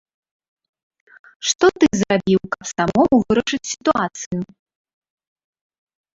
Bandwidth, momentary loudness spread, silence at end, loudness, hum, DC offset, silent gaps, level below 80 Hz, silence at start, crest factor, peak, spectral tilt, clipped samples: 8 kHz; 12 LU; 1.7 s; -19 LUFS; none; under 0.1%; 1.55-1.59 s, 4.26-4.31 s; -50 dBFS; 1.4 s; 20 dB; -2 dBFS; -4.5 dB/octave; under 0.1%